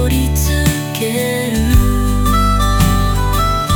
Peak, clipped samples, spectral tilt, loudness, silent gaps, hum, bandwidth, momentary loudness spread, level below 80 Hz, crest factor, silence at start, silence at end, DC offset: 0 dBFS; under 0.1%; -5 dB/octave; -15 LUFS; none; none; 20 kHz; 3 LU; -18 dBFS; 12 dB; 0 s; 0 s; under 0.1%